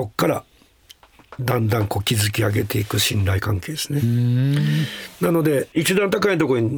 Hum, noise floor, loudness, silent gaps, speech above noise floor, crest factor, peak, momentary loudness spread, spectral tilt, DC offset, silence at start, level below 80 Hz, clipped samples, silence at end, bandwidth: none; -51 dBFS; -20 LUFS; none; 31 dB; 16 dB; -4 dBFS; 6 LU; -5.5 dB/octave; under 0.1%; 0 s; -52 dBFS; under 0.1%; 0 s; over 20 kHz